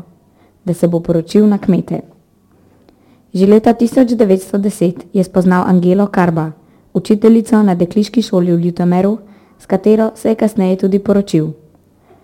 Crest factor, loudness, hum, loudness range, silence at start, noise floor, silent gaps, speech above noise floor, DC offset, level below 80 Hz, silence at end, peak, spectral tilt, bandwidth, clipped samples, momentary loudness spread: 12 dB; -13 LUFS; none; 2 LU; 0.65 s; -50 dBFS; none; 39 dB; under 0.1%; -48 dBFS; 0.7 s; 0 dBFS; -8 dB/octave; 16 kHz; under 0.1%; 10 LU